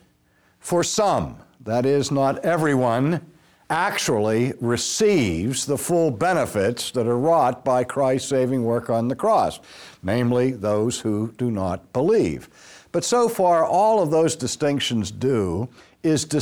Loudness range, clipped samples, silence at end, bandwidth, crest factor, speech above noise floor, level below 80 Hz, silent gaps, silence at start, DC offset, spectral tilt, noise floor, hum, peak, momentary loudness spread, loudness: 2 LU; under 0.1%; 0 s; over 20 kHz; 12 dB; 40 dB; -52 dBFS; none; 0.65 s; under 0.1%; -5 dB/octave; -61 dBFS; none; -8 dBFS; 8 LU; -21 LUFS